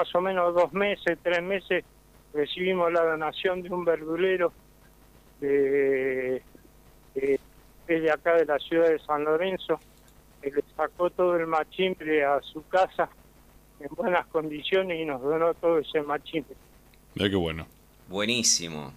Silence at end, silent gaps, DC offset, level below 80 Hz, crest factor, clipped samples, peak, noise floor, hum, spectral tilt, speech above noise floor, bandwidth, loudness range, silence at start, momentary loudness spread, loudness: 0 s; none; under 0.1%; -58 dBFS; 20 dB; under 0.1%; -8 dBFS; -55 dBFS; none; -3.5 dB/octave; 29 dB; 15.5 kHz; 2 LU; 0 s; 9 LU; -27 LUFS